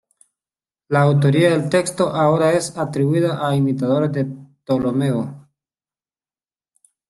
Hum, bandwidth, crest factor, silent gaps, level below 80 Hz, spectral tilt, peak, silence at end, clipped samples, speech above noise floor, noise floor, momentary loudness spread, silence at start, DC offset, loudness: none; 12 kHz; 16 dB; none; -58 dBFS; -6.5 dB/octave; -4 dBFS; 1.7 s; under 0.1%; over 73 dB; under -90 dBFS; 9 LU; 0.9 s; under 0.1%; -18 LUFS